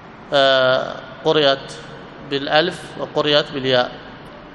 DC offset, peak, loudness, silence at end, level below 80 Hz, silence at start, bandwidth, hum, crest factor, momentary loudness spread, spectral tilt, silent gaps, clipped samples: under 0.1%; 0 dBFS; -18 LUFS; 0 s; -54 dBFS; 0 s; 11.5 kHz; none; 20 dB; 21 LU; -4.5 dB/octave; none; under 0.1%